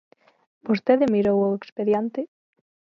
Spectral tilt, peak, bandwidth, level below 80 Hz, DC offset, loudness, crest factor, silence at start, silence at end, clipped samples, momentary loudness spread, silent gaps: -8.5 dB/octave; -4 dBFS; 7 kHz; -62 dBFS; under 0.1%; -22 LUFS; 20 dB; 0.65 s; 0.65 s; under 0.1%; 14 LU; 1.72-1.76 s